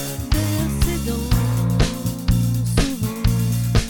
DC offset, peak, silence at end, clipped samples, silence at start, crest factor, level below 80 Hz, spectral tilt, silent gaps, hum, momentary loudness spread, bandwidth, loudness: under 0.1%; -2 dBFS; 0 s; under 0.1%; 0 s; 16 dB; -26 dBFS; -5.5 dB/octave; none; none; 3 LU; 19.5 kHz; -21 LUFS